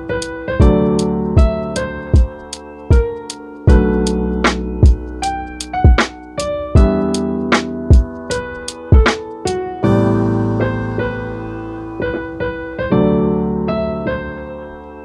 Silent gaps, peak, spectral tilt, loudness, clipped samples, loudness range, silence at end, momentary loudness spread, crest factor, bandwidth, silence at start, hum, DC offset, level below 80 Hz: none; 0 dBFS; -6.5 dB/octave; -16 LUFS; under 0.1%; 3 LU; 0 s; 13 LU; 16 dB; 11 kHz; 0 s; none; under 0.1%; -20 dBFS